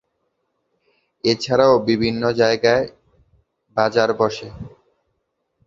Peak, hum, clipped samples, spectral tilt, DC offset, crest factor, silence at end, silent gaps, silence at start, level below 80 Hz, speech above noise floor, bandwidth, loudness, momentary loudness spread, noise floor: 0 dBFS; none; under 0.1%; -5.5 dB/octave; under 0.1%; 20 dB; 1 s; none; 1.25 s; -52 dBFS; 55 dB; 7.6 kHz; -18 LUFS; 16 LU; -73 dBFS